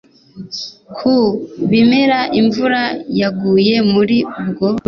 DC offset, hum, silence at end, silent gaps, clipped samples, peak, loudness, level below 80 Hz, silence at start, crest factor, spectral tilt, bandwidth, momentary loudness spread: under 0.1%; none; 0.1 s; none; under 0.1%; -2 dBFS; -14 LUFS; -52 dBFS; 0.35 s; 12 dB; -6.5 dB/octave; 6.6 kHz; 13 LU